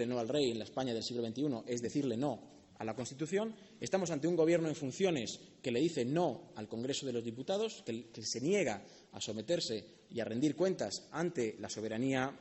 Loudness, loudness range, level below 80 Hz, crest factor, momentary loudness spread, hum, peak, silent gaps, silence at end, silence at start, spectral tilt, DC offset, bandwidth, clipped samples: -37 LUFS; 3 LU; -74 dBFS; 18 dB; 10 LU; none; -18 dBFS; none; 0 s; 0 s; -5 dB/octave; under 0.1%; 8.2 kHz; under 0.1%